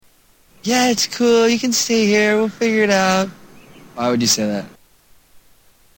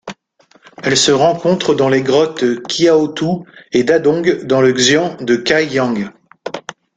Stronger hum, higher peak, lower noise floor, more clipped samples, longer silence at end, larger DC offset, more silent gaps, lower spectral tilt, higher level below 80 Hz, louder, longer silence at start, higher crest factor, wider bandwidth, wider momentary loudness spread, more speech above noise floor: neither; about the same, -2 dBFS vs 0 dBFS; about the same, -53 dBFS vs -52 dBFS; neither; first, 0.6 s vs 0.25 s; neither; neither; about the same, -3 dB/octave vs -4 dB/octave; about the same, -56 dBFS vs -54 dBFS; about the same, -16 LUFS vs -14 LUFS; first, 0.65 s vs 0.05 s; about the same, 16 dB vs 14 dB; first, 17 kHz vs 9.4 kHz; second, 9 LU vs 15 LU; about the same, 37 dB vs 39 dB